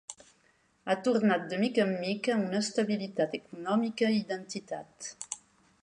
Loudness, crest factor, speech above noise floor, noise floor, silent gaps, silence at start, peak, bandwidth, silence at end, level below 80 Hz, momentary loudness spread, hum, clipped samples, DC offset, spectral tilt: -31 LUFS; 18 dB; 38 dB; -68 dBFS; none; 0.1 s; -12 dBFS; 11 kHz; 0.45 s; -78 dBFS; 14 LU; none; under 0.1%; under 0.1%; -5 dB/octave